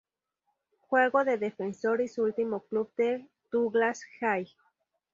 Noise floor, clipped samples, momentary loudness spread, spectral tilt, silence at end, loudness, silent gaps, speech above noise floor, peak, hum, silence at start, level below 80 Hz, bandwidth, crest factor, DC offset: -81 dBFS; under 0.1%; 8 LU; -5.5 dB/octave; 0.7 s; -29 LUFS; none; 52 dB; -10 dBFS; none; 0.9 s; -78 dBFS; 7.6 kHz; 20 dB; under 0.1%